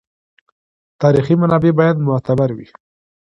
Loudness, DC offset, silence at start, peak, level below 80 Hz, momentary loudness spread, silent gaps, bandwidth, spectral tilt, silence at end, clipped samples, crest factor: -15 LUFS; under 0.1%; 1 s; 0 dBFS; -50 dBFS; 5 LU; none; 6.2 kHz; -9.5 dB/octave; 0.6 s; under 0.1%; 16 dB